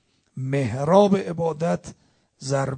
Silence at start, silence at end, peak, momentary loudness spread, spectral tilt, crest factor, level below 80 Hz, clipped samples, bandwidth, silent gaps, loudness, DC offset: 0.35 s; 0 s; -2 dBFS; 16 LU; -7 dB/octave; 20 dB; -58 dBFS; under 0.1%; 9.4 kHz; none; -22 LUFS; under 0.1%